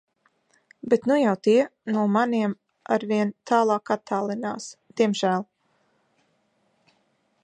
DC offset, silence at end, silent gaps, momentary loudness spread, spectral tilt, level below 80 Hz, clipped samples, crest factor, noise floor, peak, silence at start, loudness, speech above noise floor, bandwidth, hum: under 0.1%; 2 s; none; 12 LU; -6 dB/octave; -76 dBFS; under 0.1%; 18 dB; -69 dBFS; -6 dBFS; 0.85 s; -24 LUFS; 46 dB; 9.2 kHz; none